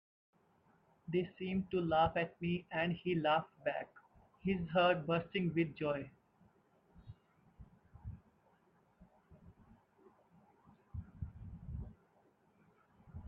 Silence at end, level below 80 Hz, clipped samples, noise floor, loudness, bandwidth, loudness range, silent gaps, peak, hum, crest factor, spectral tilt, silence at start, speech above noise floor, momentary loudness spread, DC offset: 0 s; -62 dBFS; under 0.1%; -72 dBFS; -37 LUFS; 5.6 kHz; 19 LU; none; -20 dBFS; none; 20 dB; -9 dB/octave; 1.1 s; 36 dB; 21 LU; under 0.1%